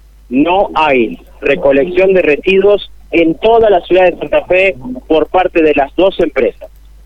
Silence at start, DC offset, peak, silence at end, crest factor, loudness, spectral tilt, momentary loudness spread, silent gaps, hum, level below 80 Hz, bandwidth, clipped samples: 0.3 s; under 0.1%; 0 dBFS; 0.4 s; 10 dB; -11 LUFS; -7 dB/octave; 6 LU; none; none; -36 dBFS; 7.2 kHz; under 0.1%